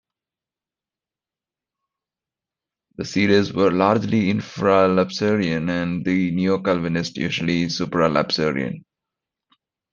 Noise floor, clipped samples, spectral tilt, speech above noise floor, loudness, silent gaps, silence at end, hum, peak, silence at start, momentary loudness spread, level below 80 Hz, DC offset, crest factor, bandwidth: -90 dBFS; under 0.1%; -6 dB/octave; 70 dB; -20 LUFS; none; 1.15 s; none; -2 dBFS; 3 s; 7 LU; -58 dBFS; under 0.1%; 20 dB; 7.4 kHz